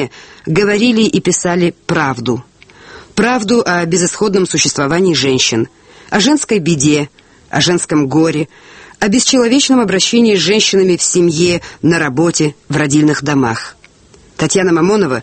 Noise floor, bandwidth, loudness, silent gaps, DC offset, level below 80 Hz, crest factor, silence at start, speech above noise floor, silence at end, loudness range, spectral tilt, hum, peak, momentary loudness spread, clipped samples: -44 dBFS; 8.8 kHz; -12 LUFS; none; under 0.1%; -46 dBFS; 12 dB; 0 s; 32 dB; 0 s; 3 LU; -4 dB/octave; none; 0 dBFS; 8 LU; under 0.1%